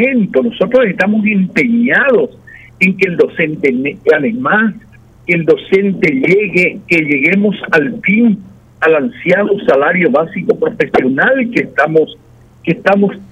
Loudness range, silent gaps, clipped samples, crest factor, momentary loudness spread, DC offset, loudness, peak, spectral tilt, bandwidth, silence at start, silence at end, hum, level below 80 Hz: 1 LU; none; under 0.1%; 12 dB; 5 LU; under 0.1%; -12 LUFS; 0 dBFS; -7.5 dB/octave; 10.5 kHz; 0 s; 0.05 s; none; -50 dBFS